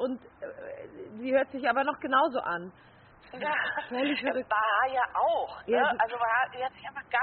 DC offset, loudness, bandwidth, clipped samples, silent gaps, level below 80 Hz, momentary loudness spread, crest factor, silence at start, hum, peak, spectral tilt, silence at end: under 0.1%; -28 LUFS; 4.5 kHz; under 0.1%; none; -68 dBFS; 17 LU; 18 dB; 0 s; none; -12 dBFS; -1 dB/octave; 0 s